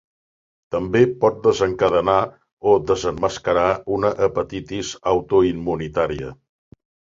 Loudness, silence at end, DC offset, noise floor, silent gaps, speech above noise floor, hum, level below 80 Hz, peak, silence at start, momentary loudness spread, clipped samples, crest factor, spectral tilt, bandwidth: -20 LUFS; 0.85 s; under 0.1%; under -90 dBFS; 2.53-2.57 s; over 71 dB; none; -46 dBFS; -2 dBFS; 0.7 s; 10 LU; under 0.1%; 18 dB; -6 dB/octave; 7.6 kHz